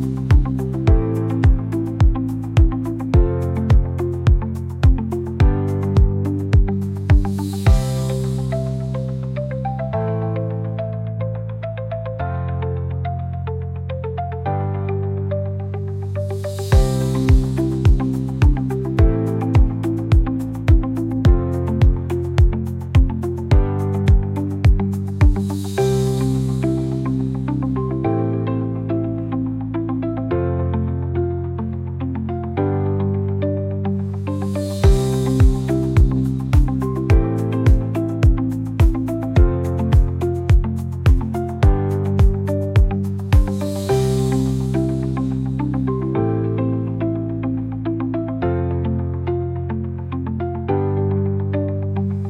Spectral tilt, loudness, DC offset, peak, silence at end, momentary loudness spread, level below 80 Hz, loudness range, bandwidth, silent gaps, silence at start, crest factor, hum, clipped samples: -8.5 dB/octave; -20 LUFS; under 0.1%; -4 dBFS; 0 s; 8 LU; -22 dBFS; 6 LU; 14 kHz; none; 0 s; 14 dB; none; under 0.1%